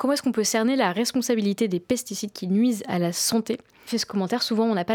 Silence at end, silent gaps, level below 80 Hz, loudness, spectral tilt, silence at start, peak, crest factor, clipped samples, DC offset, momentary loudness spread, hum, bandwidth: 0 s; none; -66 dBFS; -24 LUFS; -4 dB/octave; 0 s; -8 dBFS; 16 dB; under 0.1%; under 0.1%; 7 LU; none; 19 kHz